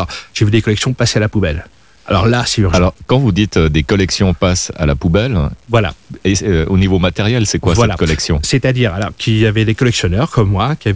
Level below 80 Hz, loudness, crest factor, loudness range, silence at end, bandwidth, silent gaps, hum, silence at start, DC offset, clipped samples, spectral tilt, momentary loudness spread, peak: -24 dBFS; -14 LUFS; 14 dB; 1 LU; 0 s; 8 kHz; none; none; 0 s; 0.5%; under 0.1%; -5.5 dB/octave; 4 LU; 0 dBFS